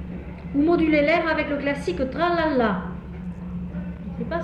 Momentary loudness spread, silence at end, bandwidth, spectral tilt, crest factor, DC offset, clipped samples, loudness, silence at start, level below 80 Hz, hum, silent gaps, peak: 15 LU; 0 s; 9.4 kHz; -7.5 dB/octave; 14 dB; under 0.1%; under 0.1%; -23 LUFS; 0 s; -40 dBFS; none; none; -10 dBFS